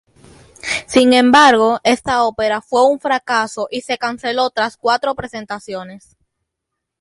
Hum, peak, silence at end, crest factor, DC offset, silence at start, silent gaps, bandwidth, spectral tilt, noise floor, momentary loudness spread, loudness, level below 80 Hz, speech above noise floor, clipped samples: none; 0 dBFS; 1.05 s; 16 dB; under 0.1%; 0.65 s; none; 11.5 kHz; -3 dB/octave; -79 dBFS; 17 LU; -15 LUFS; -52 dBFS; 63 dB; under 0.1%